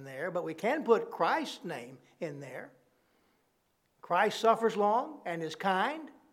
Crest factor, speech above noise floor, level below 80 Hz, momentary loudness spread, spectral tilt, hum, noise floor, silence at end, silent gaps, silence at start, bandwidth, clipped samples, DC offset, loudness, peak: 22 dB; 43 dB; -88 dBFS; 16 LU; -5 dB/octave; none; -75 dBFS; 0.2 s; none; 0 s; 15.5 kHz; under 0.1%; under 0.1%; -31 LUFS; -12 dBFS